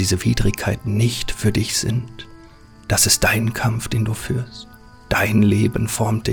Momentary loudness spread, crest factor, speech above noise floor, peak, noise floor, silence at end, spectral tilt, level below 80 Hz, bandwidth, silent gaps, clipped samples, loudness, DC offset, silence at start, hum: 11 LU; 18 dB; 25 dB; -2 dBFS; -44 dBFS; 0 s; -4 dB/octave; -36 dBFS; over 20 kHz; none; under 0.1%; -19 LUFS; 0.2%; 0 s; none